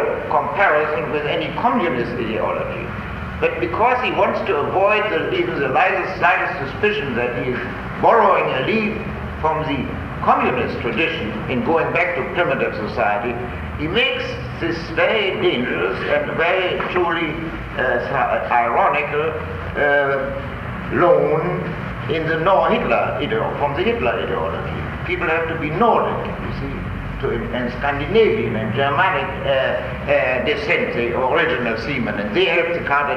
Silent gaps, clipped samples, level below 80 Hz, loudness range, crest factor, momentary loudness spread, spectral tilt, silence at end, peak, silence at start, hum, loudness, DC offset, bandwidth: none; under 0.1%; -38 dBFS; 2 LU; 16 dB; 9 LU; -7 dB/octave; 0 s; -2 dBFS; 0 s; none; -19 LUFS; under 0.1%; 14 kHz